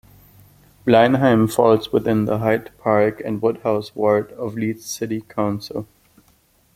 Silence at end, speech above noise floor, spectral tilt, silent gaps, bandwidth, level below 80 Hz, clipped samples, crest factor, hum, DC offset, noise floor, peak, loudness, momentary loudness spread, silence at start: 0.9 s; 39 dB; -6.5 dB/octave; none; 16 kHz; -54 dBFS; under 0.1%; 18 dB; none; under 0.1%; -58 dBFS; -2 dBFS; -19 LUFS; 12 LU; 0.85 s